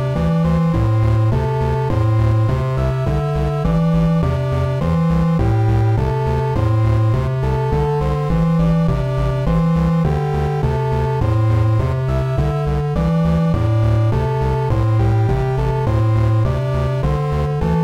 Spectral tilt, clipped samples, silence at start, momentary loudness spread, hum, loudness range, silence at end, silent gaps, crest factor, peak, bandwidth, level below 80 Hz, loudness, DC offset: -9 dB/octave; under 0.1%; 0 s; 3 LU; none; 1 LU; 0 s; none; 10 dB; -6 dBFS; 8 kHz; -26 dBFS; -17 LUFS; under 0.1%